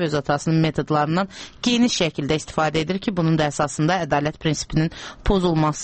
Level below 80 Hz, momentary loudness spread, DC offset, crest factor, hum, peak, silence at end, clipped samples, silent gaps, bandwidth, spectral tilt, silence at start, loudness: -38 dBFS; 5 LU; under 0.1%; 16 dB; none; -6 dBFS; 0 s; under 0.1%; none; 8.8 kHz; -5.5 dB/octave; 0 s; -21 LUFS